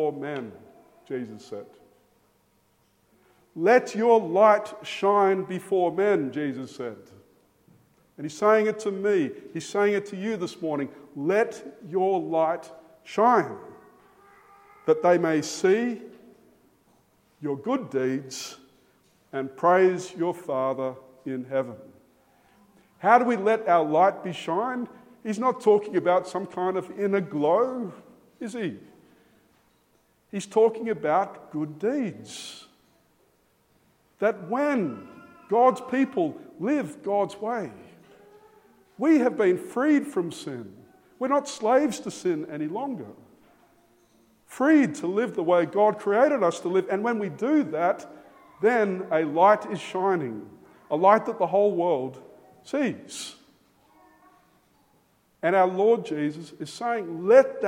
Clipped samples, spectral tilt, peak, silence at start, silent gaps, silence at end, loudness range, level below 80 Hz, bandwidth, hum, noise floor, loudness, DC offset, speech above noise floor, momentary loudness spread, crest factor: under 0.1%; -5.5 dB/octave; -4 dBFS; 0 s; none; 0 s; 7 LU; -76 dBFS; 16 kHz; none; -66 dBFS; -25 LUFS; under 0.1%; 42 dB; 16 LU; 22 dB